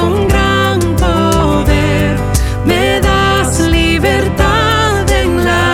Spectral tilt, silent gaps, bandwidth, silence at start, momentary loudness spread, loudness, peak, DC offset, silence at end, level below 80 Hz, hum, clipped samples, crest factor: -5 dB/octave; none; 17 kHz; 0 s; 3 LU; -11 LUFS; 0 dBFS; under 0.1%; 0 s; -20 dBFS; none; under 0.1%; 10 dB